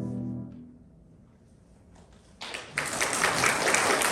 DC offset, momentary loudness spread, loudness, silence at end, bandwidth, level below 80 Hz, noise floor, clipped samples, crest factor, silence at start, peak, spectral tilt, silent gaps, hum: under 0.1%; 19 LU; -26 LUFS; 0 s; 19 kHz; -58 dBFS; -56 dBFS; under 0.1%; 26 dB; 0 s; -4 dBFS; -2 dB/octave; none; none